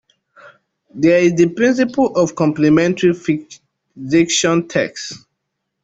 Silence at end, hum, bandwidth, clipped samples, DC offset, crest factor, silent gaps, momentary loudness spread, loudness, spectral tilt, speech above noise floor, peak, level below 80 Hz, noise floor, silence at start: 0.65 s; none; 8 kHz; under 0.1%; under 0.1%; 14 dB; none; 11 LU; -15 LUFS; -5 dB/octave; 60 dB; -2 dBFS; -56 dBFS; -75 dBFS; 0.45 s